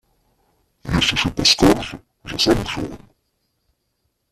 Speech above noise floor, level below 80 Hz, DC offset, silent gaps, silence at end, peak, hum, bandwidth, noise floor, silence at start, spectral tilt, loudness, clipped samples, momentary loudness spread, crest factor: 53 dB; -38 dBFS; under 0.1%; none; 1.35 s; -2 dBFS; none; 15 kHz; -71 dBFS; 0.85 s; -3.5 dB/octave; -17 LUFS; under 0.1%; 18 LU; 20 dB